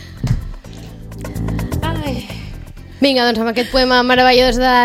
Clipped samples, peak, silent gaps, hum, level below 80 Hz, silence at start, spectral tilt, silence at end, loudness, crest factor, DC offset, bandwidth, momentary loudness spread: under 0.1%; 0 dBFS; none; none; -30 dBFS; 0 s; -5 dB/octave; 0 s; -15 LUFS; 16 dB; under 0.1%; 16 kHz; 23 LU